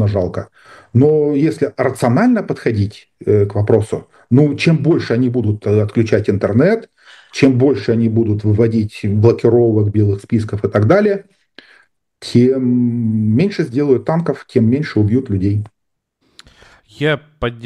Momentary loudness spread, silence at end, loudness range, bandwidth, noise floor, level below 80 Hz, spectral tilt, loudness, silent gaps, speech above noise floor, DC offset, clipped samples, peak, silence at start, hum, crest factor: 8 LU; 0 s; 2 LU; 10.5 kHz; -68 dBFS; -48 dBFS; -8 dB/octave; -15 LUFS; none; 54 dB; under 0.1%; under 0.1%; 0 dBFS; 0 s; none; 14 dB